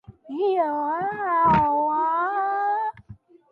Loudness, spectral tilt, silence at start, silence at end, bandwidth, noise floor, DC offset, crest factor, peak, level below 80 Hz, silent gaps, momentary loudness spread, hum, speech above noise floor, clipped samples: -23 LUFS; -8.5 dB/octave; 0.1 s; 0.35 s; 5.6 kHz; -48 dBFS; under 0.1%; 16 dB; -8 dBFS; -52 dBFS; none; 8 LU; none; 26 dB; under 0.1%